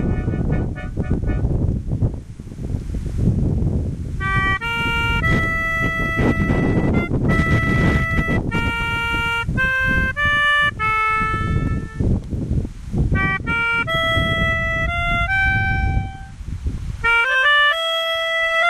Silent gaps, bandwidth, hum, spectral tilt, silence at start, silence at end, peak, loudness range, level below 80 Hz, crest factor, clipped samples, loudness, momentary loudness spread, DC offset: none; 13.5 kHz; none; -6 dB/octave; 0 s; 0 s; -6 dBFS; 4 LU; -26 dBFS; 14 dB; under 0.1%; -19 LUFS; 10 LU; under 0.1%